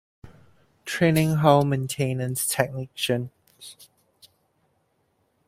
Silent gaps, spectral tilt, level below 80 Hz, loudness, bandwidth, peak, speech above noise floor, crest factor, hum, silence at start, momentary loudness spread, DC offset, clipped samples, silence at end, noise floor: none; -5 dB/octave; -60 dBFS; -23 LUFS; 16 kHz; -2 dBFS; 47 dB; 24 dB; none; 0.25 s; 24 LU; under 0.1%; under 0.1%; 1.65 s; -70 dBFS